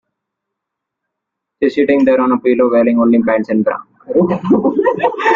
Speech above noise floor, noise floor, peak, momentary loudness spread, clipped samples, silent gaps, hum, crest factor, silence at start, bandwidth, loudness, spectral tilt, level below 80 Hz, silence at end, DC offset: 67 dB; -79 dBFS; -2 dBFS; 6 LU; under 0.1%; none; none; 12 dB; 1.6 s; 7.2 kHz; -13 LUFS; -8 dB/octave; -54 dBFS; 0 s; under 0.1%